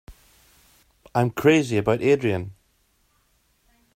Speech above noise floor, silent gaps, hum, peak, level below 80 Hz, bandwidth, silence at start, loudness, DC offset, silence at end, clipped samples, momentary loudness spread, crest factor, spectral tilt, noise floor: 45 dB; none; none; -6 dBFS; -56 dBFS; 16 kHz; 0.1 s; -21 LUFS; under 0.1%; 1.45 s; under 0.1%; 11 LU; 20 dB; -6.5 dB/octave; -65 dBFS